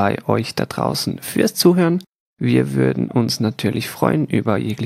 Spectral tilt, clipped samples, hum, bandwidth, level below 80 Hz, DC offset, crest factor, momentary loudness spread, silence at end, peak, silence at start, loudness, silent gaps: -5.5 dB/octave; under 0.1%; none; 16.5 kHz; -56 dBFS; under 0.1%; 18 dB; 8 LU; 0 s; 0 dBFS; 0 s; -19 LUFS; 2.20-2.33 s